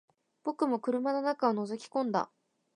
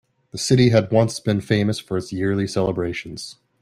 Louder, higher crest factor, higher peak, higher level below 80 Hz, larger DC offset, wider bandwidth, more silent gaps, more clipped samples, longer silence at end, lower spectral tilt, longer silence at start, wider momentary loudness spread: second, -32 LUFS vs -20 LUFS; about the same, 20 dB vs 18 dB; second, -14 dBFS vs -4 dBFS; second, -88 dBFS vs -52 dBFS; neither; second, 11 kHz vs 13 kHz; neither; neither; first, 0.5 s vs 0.3 s; about the same, -6 dB/octave vs -6 dB/octave; about the same, 0.45 s vs 0.35 s; second, 9 LU vs 17 LU